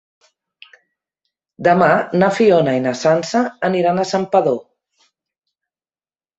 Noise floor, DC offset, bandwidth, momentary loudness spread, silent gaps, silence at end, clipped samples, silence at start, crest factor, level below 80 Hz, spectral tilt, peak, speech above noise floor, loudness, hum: under -90 dBFS; under 0.1%; 8.2 kHz; 6 LU; none; 1.8 s; under 0.1%; 1.6 s; 16 dB; -62 dBFS; -6 dB/octave; -2 dBFS; over 75 dB; -16 LUFS; none